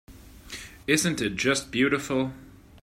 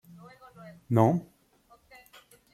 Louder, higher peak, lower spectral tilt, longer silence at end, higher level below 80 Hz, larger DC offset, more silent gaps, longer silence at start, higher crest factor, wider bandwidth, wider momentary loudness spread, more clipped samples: about the same, -25 LUFS vs -26 LUFS; about the same, -6 dBFS vs -8 dBFS; second, -3.5 dB/octave vs -9 dB/octave; second, 0.05 s vs 1.3 s; first, -52 dBFS vs -68 dBFS; neither; neither; second, 0.1 s vs 0.65 s; about the same, 20 dB vs 24 dB; first, 16 kHz vs 14.5 kHz; second, 16 LU vs 27 LU; neither